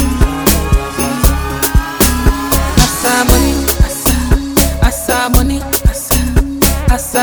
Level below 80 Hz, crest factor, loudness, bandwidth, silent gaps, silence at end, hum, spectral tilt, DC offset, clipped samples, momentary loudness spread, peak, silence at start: -14 dBFS; 12 dB; -12 LUFS; over 20 kHz; none; 0 s; none; -4 dB/octave; 0.4%; 0.2%; 4 LU; 0 dBFS; 0 s